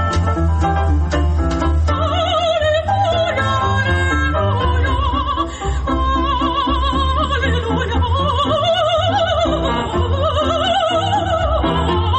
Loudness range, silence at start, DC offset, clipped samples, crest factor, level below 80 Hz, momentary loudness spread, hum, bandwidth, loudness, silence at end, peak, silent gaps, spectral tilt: 1 LU; 0 s; under 0.1%; under 0.1%; 10 dB; -22 dBFS; 3 LU; none; 8.6 kHz; -17 LUFS; 0 s; -6 dBFS; none; -6 dB/octave